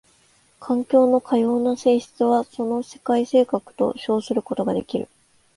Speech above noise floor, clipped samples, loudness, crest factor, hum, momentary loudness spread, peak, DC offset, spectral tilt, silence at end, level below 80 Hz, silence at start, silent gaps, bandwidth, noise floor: 38 dB; under 0.1%; -21 LUFS; 16 dB; none; 8 LU; -4 dBFS; under 0.1%; -6.5 dB/octave; 0.55 s; -62 dBFS; 0.6 s; none; 11.5 kHz; -59 dBFS